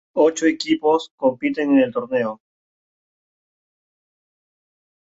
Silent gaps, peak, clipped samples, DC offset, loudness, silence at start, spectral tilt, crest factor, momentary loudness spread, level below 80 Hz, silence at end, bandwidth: 1.11-1.18 s; -4 dBFS; under 0.1%; under 0.1%; -20 LUFS; 0.15 s; -4.5 dB/octave; 18 dB; 6 LU; -66 dBFS; 2.75 s; 8 kHz